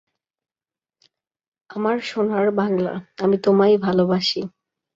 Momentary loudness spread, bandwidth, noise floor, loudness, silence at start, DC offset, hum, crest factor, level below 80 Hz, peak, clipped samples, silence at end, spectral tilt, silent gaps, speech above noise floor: 11 LU; 7.8 kHz; under -90 dBFS; -20 LUFS; 1.7 s; under 0.1%; none; 16 dB; -64 dBFS; -6 dBFS; under 0.1%; 0.45 s; -6.5 dB/octave; none; over 71 dB